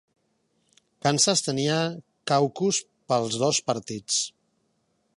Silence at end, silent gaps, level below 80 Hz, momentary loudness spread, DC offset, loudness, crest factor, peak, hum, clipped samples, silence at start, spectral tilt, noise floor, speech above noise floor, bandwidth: 0.9 s; none; -70 dBFS; 9 LU; under 0.1%; -25 LUFS; 22 dB; -4 dBFS; none; under 0.1%; 1.05 s; -3.5 dB/octave; -71 dBFS; 47 dB; 11.5 kHz